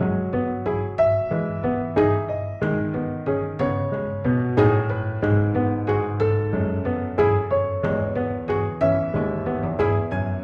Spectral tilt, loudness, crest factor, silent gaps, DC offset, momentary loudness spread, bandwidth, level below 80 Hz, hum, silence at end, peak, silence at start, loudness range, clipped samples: -10.5 dB/octave; -23 LUFS; 18 dB; none; under 0.1%; 5 LU; 5.4 kHz; -44 dBFS; none; 0 s; -4 dBFS; 0 s; 2 LU; under 0.1%